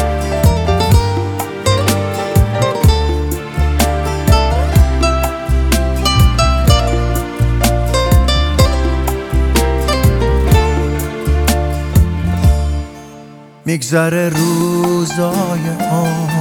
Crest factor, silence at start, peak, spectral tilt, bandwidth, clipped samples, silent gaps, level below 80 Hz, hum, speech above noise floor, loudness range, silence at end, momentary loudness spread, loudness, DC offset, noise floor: 12 dB; 0 s; 0 dBFS; -5.5 dB/octave; 18.5 kHz; under 0.1%; none; -16 dBFS; none; 22 dB; 3 LU; 0 s; 6 LU; -14 LUFS; under 0.1%; -36 dBFS